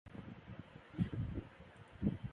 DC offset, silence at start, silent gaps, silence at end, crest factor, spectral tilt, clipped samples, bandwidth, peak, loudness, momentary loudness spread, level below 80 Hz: under 0.1%; 0.05 s; none; 0 s; 22 dB; -9.5 dB/octave; under 0.1%; 9.4 kHz; -22 dBFS; -44 LUFS; 17 LU; -56 dBFS